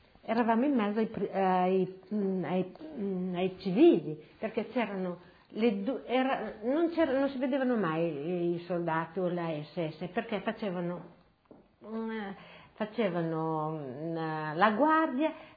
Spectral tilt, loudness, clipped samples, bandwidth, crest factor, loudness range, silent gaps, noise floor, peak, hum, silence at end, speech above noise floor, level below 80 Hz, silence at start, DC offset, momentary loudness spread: -10 dB/octave; -31 LUFS; under 0.1%; 5 kHz; 20 dB; 7 LU; none; -60 dBFS; -10 dBFS; none; 0.05 s; 29 dB; -70 dBFS; 0.25 s; under 0.1%; 12 LU